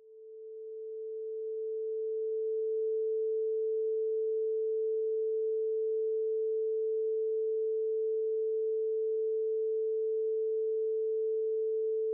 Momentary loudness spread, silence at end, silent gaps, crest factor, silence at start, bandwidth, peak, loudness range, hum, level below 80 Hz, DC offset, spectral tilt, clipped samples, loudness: 6 LU; 0 s; none; 4 dB; 0.05 s; 0.6 kHz; -28 dBFS; 2 LU; none; under -90 dBFS; under 0.1%; 2 dB/octave; under 0.1%; -33 LUFS